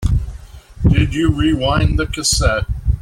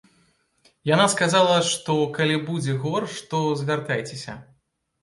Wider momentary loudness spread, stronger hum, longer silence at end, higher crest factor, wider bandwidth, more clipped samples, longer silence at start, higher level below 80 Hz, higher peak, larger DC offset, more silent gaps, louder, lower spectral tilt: second, 6 LU vs 14 LU; neither; second, 0 s vs 0.6 s; second, 14 dB vs 20 dB; first, 15 kHz vs 11.5 kHz; neither; second, 0 s vs 0.85 s; first, -22 dBFS vs -64 dBFS; about the same, -2 dBFS vs -4 dBFS; neither; neither; first, -16 LUFS vs -22 LUFS; about the same, -5 dB/octave vs -4.5 dB/octave